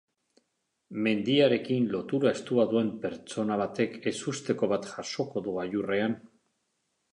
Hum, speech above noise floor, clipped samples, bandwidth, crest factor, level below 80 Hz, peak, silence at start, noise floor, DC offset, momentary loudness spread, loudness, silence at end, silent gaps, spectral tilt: none; 51 dB; under 0.1%; 11 kHz; 18 dB; -70 dBFS; -10 dBFS; 0.9 s; -79 dBFS; under 0.1%; 9 LU; -29 LUFS; 0.85 s; none; -5.5 dB/octave